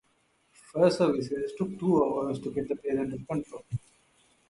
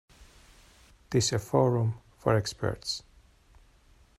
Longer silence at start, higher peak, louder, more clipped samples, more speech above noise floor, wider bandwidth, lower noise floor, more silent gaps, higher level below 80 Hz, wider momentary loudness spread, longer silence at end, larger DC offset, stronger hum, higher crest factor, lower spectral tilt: first, 0.75 s vs 0.2 s; about the same, -10 dBFS vs -10 dBFS; about the same, -29 LUFS vs -29 LUFS; neither; first, 41 dB vs 33 dB; second, 11.5 kHz vs 13.5 kHz; first, -70 dBFS vs -60 dBFS; neither; second, -62 dBFS vs -56 dBFS; first, 13 LU vs 9 LU; second, 0.7 s vs 1.2 s; neither; neither; about the same, 20 dB vs 22 dB; first, -7 dB/octave vs -5 dB/octave